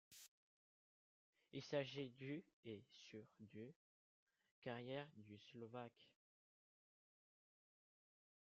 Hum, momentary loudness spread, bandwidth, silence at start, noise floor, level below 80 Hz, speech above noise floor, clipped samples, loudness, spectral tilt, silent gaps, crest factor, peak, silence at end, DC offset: none; 15 LU; 7.2 kHz; 0.1 s; under -90 dBFS; under -90 dBFS; over 37 dB; under 0.1%; -54 LUFS; -4.5 dB/octave; 0.28-1.33 s, 2.53-2.63 s, 3.76-4.27 s, 4.51-4.62 s; 26 dB; -32 dBFS; 2.4 s; under 0.1%